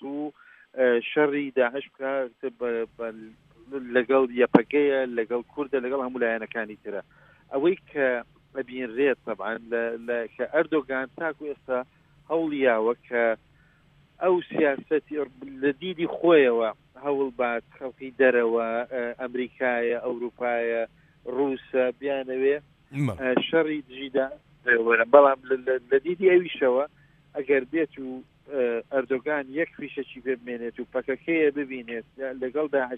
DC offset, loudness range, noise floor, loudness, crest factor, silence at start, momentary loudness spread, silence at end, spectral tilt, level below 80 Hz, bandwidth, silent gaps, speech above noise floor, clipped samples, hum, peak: under 0.1%; 6 LU; -60 dBFS; -26 LUFS; 26 dB; 0 s; 14 LU; 0 s; -7.5 dB/octave; -66 dBFS; 4.1 kHz; none; 34 dB; under 0.1%; none; 0 dBFS